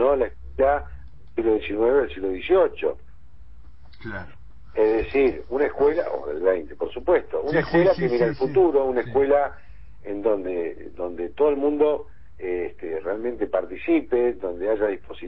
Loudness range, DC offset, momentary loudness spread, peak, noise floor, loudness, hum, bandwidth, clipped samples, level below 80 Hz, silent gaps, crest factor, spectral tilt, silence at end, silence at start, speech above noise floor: 4 LU; 1%; 13 LU; -8 dBFS; -49 dBFS; -23 LUFS; none; 5.8 kHz; under 0.1%; -46 dBFS; none; 16 dB; -10 dB/octave; 0 s; 0 s; 26 dB